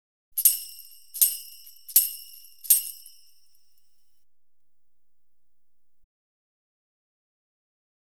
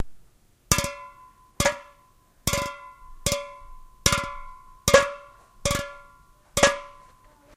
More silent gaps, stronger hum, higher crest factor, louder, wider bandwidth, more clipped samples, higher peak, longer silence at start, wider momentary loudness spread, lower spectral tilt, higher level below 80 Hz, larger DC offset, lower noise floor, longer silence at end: neither; neither; about the same, 28 dB vs 28 dB; first, -22 LUFS vs -25 LUFS; first, over 20 kHz vs 16 kHz; neither; about the same, -2 dBFS vs 0 dBFS; first, 0.35 s vs 0 s; about the same, 20 LU vs 22 LU; second, 5.5 dB/octave vs -2.5 dB/octave; second, -82 dBFS vs -42 dBFS; first, 0.3% vs under 0.1%; first, -84 dBFS vs -58 dBFS; first, 5.05 s vs 0.65 s